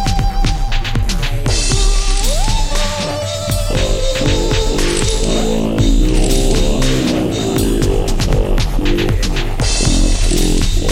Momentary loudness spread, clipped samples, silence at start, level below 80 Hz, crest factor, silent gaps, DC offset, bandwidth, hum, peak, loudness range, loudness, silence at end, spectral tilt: 4 LU; under 0.1%; 0 s; -14 dBFS; 12 dB; none; under 0.1%; 16 kHz; none; -2 dBFS; 2 LU; -16 LUFS; 0 s; -4.5 dB/octave